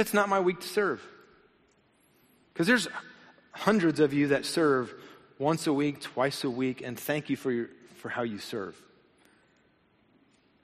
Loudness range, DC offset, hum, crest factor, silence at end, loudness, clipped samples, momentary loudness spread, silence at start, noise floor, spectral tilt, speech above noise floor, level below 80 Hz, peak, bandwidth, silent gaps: 8 LU; under 0.1%; none; 22 dB; 1.9 s; -29 LUFS; under 0.1%; 15 LU; 0 s; -66 dBFS; -5 dB/octave; 38 dB; -70 dBFS; -10 dBFS; 13 kHz; none